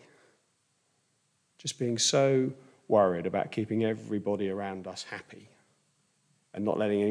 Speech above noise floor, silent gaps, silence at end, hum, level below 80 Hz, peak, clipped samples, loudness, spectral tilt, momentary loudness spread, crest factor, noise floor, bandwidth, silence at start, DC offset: 45 dB; none; 0 s; none; -78 dBFS; -12 dBFS; under 0.1%; -29 LUFS; -4.5 dB/octave; 14 LU; 20 dB; -73 dBFS; 10.5 kHz; 1.65 s; under 0.1%